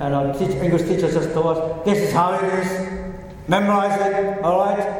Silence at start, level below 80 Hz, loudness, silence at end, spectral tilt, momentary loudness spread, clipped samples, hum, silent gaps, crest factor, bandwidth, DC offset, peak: 0 s; -42 dBFS; -20 LUFS; 0 s; -6.5 dB/octave; 8 LU; under 0.1%; none; none; 16 dB; 17 kHz; under 0.1%; -4 dBFS